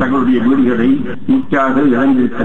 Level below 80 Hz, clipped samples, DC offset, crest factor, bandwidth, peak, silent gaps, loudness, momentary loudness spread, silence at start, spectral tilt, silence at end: -46 dBFS; under 0.1%; 7%; 10 dB; 4.1 kHz; -2 dBFS; none; -13 LUFS; 4 LU; 0 s; -8.5 dB/octave; 0 s